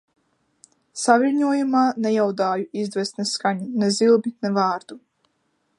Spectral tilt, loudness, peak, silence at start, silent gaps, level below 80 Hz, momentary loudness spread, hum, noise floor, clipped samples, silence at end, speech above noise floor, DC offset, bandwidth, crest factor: -4.5 dB/octave; -21 LUFS; -2 dBFS; 0.95 s; none; -72 dBFS; 8 LU; none; -70 dBFS; under 0.1%; 0.8 s; 49 dB; under 0.1%; 11.5 kHz; 20 dB